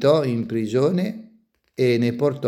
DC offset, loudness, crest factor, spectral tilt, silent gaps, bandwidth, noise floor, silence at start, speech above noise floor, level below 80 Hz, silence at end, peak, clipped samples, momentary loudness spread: under 0.1%; -21 LUFS; 16 dB; -7.5 dB/octave; none; 13.5 kHz; -58 dBFS; 0 s; 39 dB; -66 dBFS; 0 s; -6 dBFS; under 0.1%; 11 LU